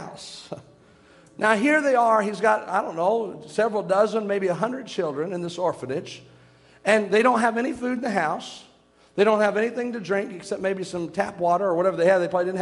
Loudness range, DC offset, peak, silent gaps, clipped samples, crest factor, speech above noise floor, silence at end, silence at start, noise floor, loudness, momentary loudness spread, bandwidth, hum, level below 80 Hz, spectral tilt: 4 LU; under 0.1%; -4 dBFS; none; under 0.1%; 20 dB; 31 dB; 0 s; 0 s; -53 dBFS; -23 LUFS; 13 LU; 11.5 kHz; none; -68 dBFS; -5 dB/octave